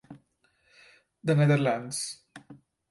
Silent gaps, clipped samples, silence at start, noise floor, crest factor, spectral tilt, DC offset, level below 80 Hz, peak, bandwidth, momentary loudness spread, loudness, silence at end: none; under 0.1%; 0.1 s; -70 dBFS; 18 dB; -6 dB/octave; under 0.1%; -72 dBFS; -12 dBFS; 11.5 kHz; 14 LU; -27 LUFS; 0.35 s